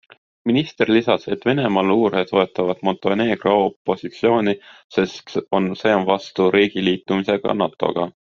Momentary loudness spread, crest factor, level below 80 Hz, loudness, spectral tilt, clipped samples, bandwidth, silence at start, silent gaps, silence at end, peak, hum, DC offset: 6 LU; 18 dB; -58 dBFS; -19 LUFS; -4 dB/octave; under 0.1%; 7.2 kHz; 0.45 s; 3.76-3.85 s, 4.84-4.90 s; 0.15 s; -2 dBFS; none; under 0.1%